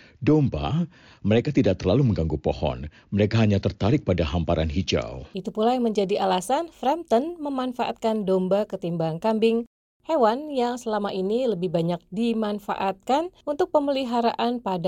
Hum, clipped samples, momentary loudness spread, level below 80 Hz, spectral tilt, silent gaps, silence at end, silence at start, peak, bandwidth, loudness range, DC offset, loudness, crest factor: none; under 0.1%; 7 LU; -42 dBFS; -7 dB/octave; 9.67-10.00 s; 0 s; 0.2 s; -8 dBFS; 15 kHz; 2 LU; under 0.1%; -24 LUFS; 16 dB